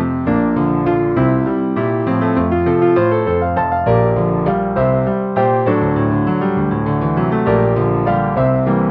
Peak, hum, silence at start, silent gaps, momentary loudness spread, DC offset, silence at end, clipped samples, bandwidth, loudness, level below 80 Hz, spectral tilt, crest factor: -2 dBFS; none; 0 s; none; 3 LU; under 0.1%; 0 s; under 0.1%; 5 kHz; -16 LUFS; -36 dBFS; -11.5 dB/octave; 14 dB